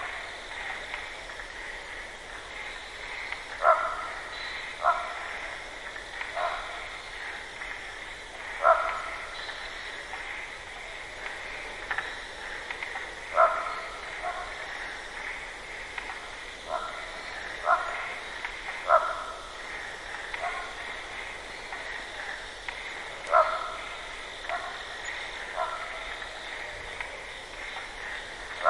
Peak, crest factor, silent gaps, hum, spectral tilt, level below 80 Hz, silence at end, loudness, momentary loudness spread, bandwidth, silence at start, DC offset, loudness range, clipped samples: -8 dBFS; 24 dB; none; none; -1.5 dB/octave; -54 dBFS; 0 s; -32 LUFS; 14 LU; 11.5 kHz; 0 s; under 0.1%; 6 LU; under 0.1%